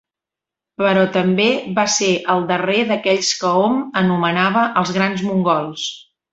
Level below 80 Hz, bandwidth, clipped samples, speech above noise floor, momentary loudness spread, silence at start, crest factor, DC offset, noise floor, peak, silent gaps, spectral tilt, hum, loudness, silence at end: -60 dBFS; 8.2 kHz; under 0.1%; 70 dB; 3 LU; 0.8 s; 16 dB; under 0.1%; -86 dBFS; -2 dBFS; none; -4 dB/octave; none; -17 LUFS; 0.3 s